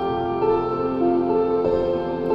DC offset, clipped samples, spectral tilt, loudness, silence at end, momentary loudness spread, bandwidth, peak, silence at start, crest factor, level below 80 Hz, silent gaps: under 0.1%; under 0.1%; -9 dB/octave; -21 LUFS; 0 s; 3 LU; 5.6 kHz; -10 dBFS; 0 s; 12 dB; -44 dBFS; none